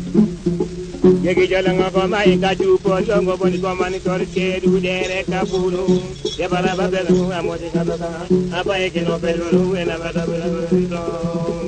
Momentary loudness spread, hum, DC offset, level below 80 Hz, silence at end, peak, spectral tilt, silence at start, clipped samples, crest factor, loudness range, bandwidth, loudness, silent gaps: 7 LU; none; under 0.1%; -40 dBFS; 0 s; 0 dBFS; -6.5 dB/octave; 0 s; under 0.1%; 16 dB; 3 LU; 9.2 kHz; -18 LUFS; none